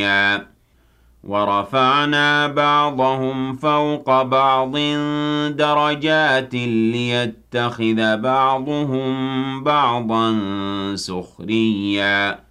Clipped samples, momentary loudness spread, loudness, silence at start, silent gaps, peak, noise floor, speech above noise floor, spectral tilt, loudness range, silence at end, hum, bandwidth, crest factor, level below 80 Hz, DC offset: under 0.1%; 8 LU; -18 LUFS; 0 s; none; -6 dBFS; -56 dBFS; 38 dB; -5.5 dB/octave; 3 LU; 0.15 s; none; 12 kHz; 14 dB; -56 dBFS; under 0.1%